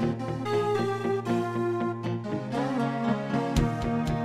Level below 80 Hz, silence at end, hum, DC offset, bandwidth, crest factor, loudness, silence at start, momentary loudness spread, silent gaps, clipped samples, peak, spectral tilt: -42 dBFS; 0 s; none; under 0.1%; 14 kHz; 18 dB; -28 LUFS; 0 s; 5 LU; none; under 0.1%; -10 dBFS; -7 dB/octave